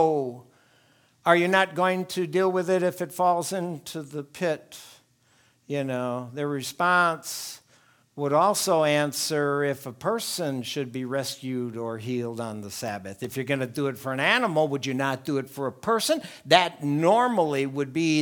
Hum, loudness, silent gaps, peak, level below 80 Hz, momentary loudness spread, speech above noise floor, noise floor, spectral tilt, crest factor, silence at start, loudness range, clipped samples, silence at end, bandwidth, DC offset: none; -26 LUFS; none; 0 dBFS; -74 dBFS; 13 LU; 38 dB; -63 dBFS; -4.5 dB/octave; 26 dB; 0 s; 7 LU; under 0.1%; 0 s; 19.5 kHz; under 0.1%